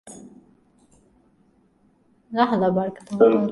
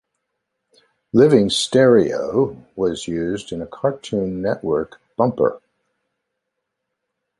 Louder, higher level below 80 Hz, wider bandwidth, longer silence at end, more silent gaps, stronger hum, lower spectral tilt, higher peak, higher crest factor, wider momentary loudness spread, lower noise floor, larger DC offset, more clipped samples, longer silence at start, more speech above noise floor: about the same, -21 LUFS vs -19 LUFS; second, -64 dBFS vs -52 dBFS; about the same, 11.5 kHz vs 11.5 kHz; second, 0 s vs 1.8 s; neither; neither; first, -7 dB/octave vs -5.5 dB/octave; about the same, -2 dBFS vs -2 dBFS; about the same, 22 dB vs 18 dB; first, 21 LU vs 11 LU; second, -61 dBFS vs -78 dBFS; neither; neither; second, 0.05 s vs 1.15 s; second, 41 dB vs 60 dB